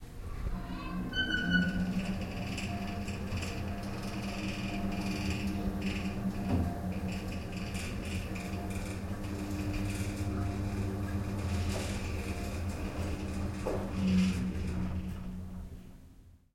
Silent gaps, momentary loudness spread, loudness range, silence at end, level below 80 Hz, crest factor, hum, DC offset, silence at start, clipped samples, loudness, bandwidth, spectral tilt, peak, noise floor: none; 8 LU; 3 LU; 0.15 s; -44 dBFS; 20 dB; none; under 0.1%; 0 s; under 0.1%; -36 LUFS; 16.5 kHz; -6 dB/octave; -14 dBFS; -56 dBFS